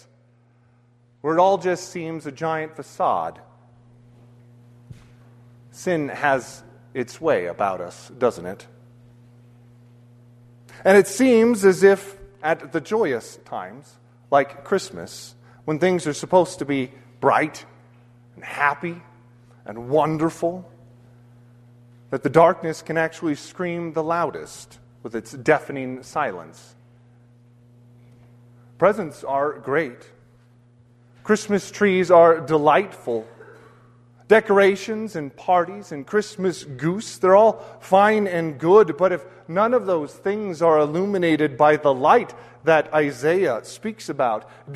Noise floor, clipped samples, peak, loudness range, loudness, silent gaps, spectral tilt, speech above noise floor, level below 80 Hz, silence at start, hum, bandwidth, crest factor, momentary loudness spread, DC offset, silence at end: -57 dBFS; under 0.1%; 0 dBFS; 9 LU; -21 LUFS; none; -5.5 dB/octave; 37 dB; -62 dBFS; 1.25 s; none; 13.5 kHz; 22 dB; 18 LU; under 0.1%; 0 s